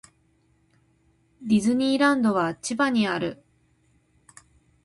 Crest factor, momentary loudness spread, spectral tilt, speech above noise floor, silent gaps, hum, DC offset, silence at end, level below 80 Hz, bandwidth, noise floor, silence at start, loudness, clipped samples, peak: 16 dB; 9 LU; -5 dB/octave; 42 dB; none; none; under 0.1%; 1.5 s; -64 dBFS; 11.5 kHz; -65 dBFS; 1.4 s; -23 LUFS; under 0.1%; -10 dBFS